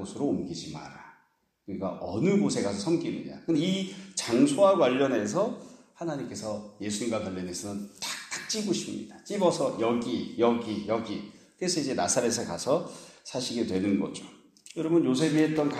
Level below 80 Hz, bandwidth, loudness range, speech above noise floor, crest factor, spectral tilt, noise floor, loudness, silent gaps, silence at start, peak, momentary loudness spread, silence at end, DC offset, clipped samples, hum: -68 dBFS; 14.5 kHz; 6 LU; 40 dB; 18 dB; -4.5 dB/octave; -68 dBFS; -28 LUFS; none; 0 s; -10 dBFS; 13 LU; 0 s; under 0.1%; under 0.1%; none